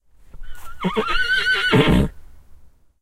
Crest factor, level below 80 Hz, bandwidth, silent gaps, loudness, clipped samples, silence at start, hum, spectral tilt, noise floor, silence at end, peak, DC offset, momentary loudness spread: 20 dB; -32 dBFS; 16 kHz; none; -19 LUFS; under 0.1%; 0.35 s; none; -5.5 dB/octave; -45 dBFS; 0.35 s; 0 dBFS; under 0.1%; 10 LU